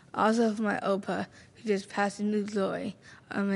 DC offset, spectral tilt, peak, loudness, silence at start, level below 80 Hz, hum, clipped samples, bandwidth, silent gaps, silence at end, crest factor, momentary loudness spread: under 0.1%; -6 dB/octave; -12 dBFS; -30 LUFS; 0.15 s; -72 dBFS; none; under 0.1%; 11.5 kHz; none; 0 s; 18 dB; 11 LU